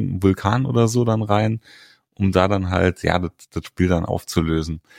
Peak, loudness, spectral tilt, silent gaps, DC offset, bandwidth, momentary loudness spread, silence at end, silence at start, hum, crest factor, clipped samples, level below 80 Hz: -2 dBFS; -20 LUFS; -6.5 dB/octave; none; under 0.1%; 16 kHz; 6 LU; 0.2 s; 0 s; none; 18 dB; under 0.1%; -40 dBFS